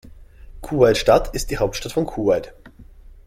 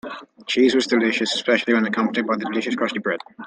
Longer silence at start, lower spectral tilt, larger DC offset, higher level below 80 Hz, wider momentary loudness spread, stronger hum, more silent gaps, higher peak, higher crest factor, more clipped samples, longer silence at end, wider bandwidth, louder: about the same, 0.05 s vs 0.05 s; about the same, -5 dB/octave vs -4 dB/octave; neither; first, -36 dBFS vs -68 dBFS; first, 11 LU vs 8 LU; neither; neither; about the same, -2 dBFS vs -4 dBFS; about the same, 18 dB vs 18 dB; neither; first, 0.45 s vs 0 s; first, 16 kHz vs 9.6 kHz; about the same, -20 LUFS vs -20 LUFS